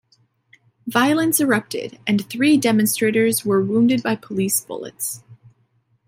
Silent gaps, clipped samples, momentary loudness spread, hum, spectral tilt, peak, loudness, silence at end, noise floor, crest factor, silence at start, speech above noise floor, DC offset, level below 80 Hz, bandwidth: none; under 0.1%; 10 LU; none; -4 dB/octave; -2 dBFS; -19 LUFS; 0.75 s; -63 dBFS; 18 dB; 0.85 s; 45 dB; under 0.1%; -66 dBFS; 16.5 kHz